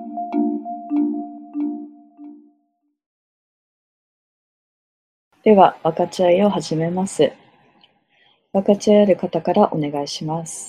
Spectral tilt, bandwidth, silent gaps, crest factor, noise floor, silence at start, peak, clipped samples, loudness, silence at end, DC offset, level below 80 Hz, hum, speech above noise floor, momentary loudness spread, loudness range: -6 dB/octave; 12 kHz; 3.06-5.31 s; 20 dB; -69 dBFS; 0 s; 0 dBFS; under 0.1%; -19 LUFS; 0 s; under 0.1%; -64 dBFS; none; 52 dB; 12 LU; 11 LU